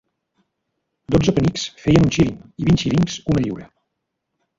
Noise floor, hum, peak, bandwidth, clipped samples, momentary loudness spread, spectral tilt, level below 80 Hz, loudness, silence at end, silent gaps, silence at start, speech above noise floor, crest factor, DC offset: -77 dBFS; none; -2 dBFS; 7.8 kHz; under 0.1%; 8 LU; -6.5 dB/octave; -38 dBFS; -19 LUFS; 0.95 s; none; 1.1 s; 59 dB; 18 dB; under 0.1%